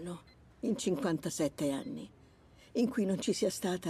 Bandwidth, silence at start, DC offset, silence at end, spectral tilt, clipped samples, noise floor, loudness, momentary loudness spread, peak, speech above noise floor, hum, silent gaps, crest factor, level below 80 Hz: 15.5 kHz; 0 s; under 0.1%; 0 s; -5 dB/octave; under 0.1%; -60 dBFS; -34 LUFS; 13 LU; -20 dBFS; 27 dB; none; none; 16 dB; -66 dBFS